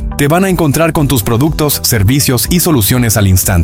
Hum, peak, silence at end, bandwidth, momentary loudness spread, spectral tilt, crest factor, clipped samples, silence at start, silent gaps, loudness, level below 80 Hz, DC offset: none; 0 dBFS; 0 s; 17 kHz; 2 LU; -4.5 dB/octave; 10 dB; under 0.1%; 0 s; none; -10 LUFS; -24 dBFS; under 0.1%